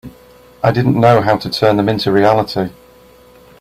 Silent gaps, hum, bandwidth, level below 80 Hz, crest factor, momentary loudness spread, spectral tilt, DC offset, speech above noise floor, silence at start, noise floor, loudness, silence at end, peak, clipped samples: none; none; 15.5 kHz; -46 dBFS; 14 dB; 9 LU; -7 dB/octave; under 0.1%; 31 dB; 0.05 s; -44 dBFS; -14 LUFS; 0.9 s; 0 dBFS; under 0.1%